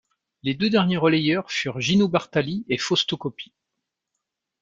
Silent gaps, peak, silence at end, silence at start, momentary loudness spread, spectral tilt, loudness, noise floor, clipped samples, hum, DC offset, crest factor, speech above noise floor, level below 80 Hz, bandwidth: none; -6 dBFS; 1.15 s; 0.45 s; 11 LU; -5 dB/octave; -22 LUFS; -82 dBFS; under 0.1%; none; under 0.1%; 18 dB; 60 dB; -60 dBFS; 7.8 kHz